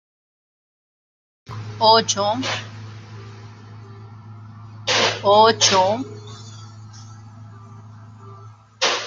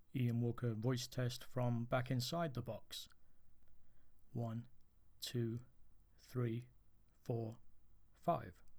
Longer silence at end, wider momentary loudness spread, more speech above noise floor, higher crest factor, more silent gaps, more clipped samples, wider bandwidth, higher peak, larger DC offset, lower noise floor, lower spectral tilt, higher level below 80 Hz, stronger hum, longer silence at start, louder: about the same, 0 s vs 0 s; first, 27 LU vs 12 LU; about the same, 27 dB vs 24 dB; about the same, 20 dB vs 20 dB; neither; neither; second, 10 kHz vs over 20 kHz; first, -2 dBFS vs -24 dBFS; neither; second, -43 dBFS vs -65 dBFS; second, -2.5 dB/octave vs -6 dB/octave; first, -62 dBFS vs -68 dBFS; neither; first, 1.5 s vs 0 s; first, -17 LUFS vs -43 LUFS